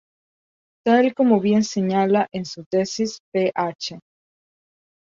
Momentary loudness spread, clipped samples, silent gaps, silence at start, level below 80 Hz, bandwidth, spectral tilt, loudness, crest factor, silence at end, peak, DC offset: 10 LU; under 0.1%; 2.66-2.71 s, 3.20-3.32 s, 3.75-3.79 s; 0.85 s; -66 dBFS; 7.6 kHz; -5.5 dB/octave; -21 LUFS; 18 dB; 1.05 s; -4 dBFS; under 0.1%